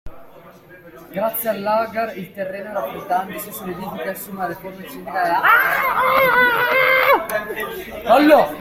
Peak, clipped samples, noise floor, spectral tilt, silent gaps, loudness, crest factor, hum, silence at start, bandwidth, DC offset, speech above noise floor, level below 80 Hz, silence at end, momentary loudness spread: 0 dBFS; under 0.1%; -43 dBFS; -4 dB/octave; none; -18 LUFS; 18 dB; none; 0.05 s; 16.5 kHz; under 0.1%; 25 dB; -52 dBFS; 0 s; 15 LU